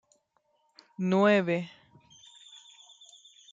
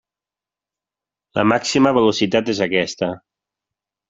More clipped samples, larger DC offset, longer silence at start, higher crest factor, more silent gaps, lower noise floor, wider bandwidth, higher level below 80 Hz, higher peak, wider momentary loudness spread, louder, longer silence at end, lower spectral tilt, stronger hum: neither; neither; second, 1 s vs 1.35 s; about the same, 20 dB vs 20 dB; neither; second, -73 dBFS vs -89 dBFS; about the same, 7.6 kHz vs 8 kHz; second, -80 dBFS vs -58 dBFS; second, -12 dBFS vs 0 dBFS; first, 27 LU vs 10 LU; second, -26 LUFS vs -18 LUFS; first, 1.85 s vs 0.9 s; first, -6.5 dB/octave vs -4.5 dB/octave; neither